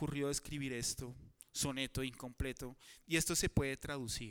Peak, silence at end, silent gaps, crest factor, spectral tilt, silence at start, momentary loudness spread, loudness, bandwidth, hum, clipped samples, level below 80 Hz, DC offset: -20 dBFS; 0 s; none; 20 dB; -3.5 dB/octave; 0 s; 15 LU; -39 LUFS; over 20 kHz; none; under 0.1%; -52 dBFS; under 0.1%